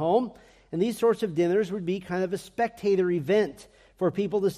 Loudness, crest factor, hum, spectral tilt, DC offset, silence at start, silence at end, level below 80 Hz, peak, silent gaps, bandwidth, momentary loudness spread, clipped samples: -27 LUFS; 16 dB; none; -6.5 dB/octave; under 0.1%; 0 s; 0 s; -62 dBFS; -10 dBFS; none; 15 kHz; 7 LU; under 0.1%